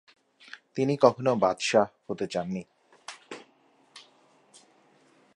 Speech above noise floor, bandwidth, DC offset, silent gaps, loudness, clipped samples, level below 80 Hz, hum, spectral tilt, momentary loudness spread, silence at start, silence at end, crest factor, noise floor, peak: 38 dB; 11.5 kHz; under 0.1%; none; -26 LUFS; under 0.1%; -70 dBFS; none; -5 dB/octave; 23 LU; 0.55 s; 1.35 s; 24 dB; -63 dBFS; -6 dBFS